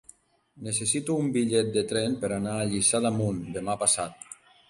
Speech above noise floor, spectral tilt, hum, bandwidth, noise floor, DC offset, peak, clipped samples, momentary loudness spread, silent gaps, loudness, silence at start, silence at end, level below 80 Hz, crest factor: 33 dB; -4 dB/octave; none; 11.5 kHz; -60 dBFS; under 0.1%; -8 dBFS; under 0.1%; 10 LU; none; -26 LUFS; 0.55 s; 0.35 s; -58 dBFS; 20 dB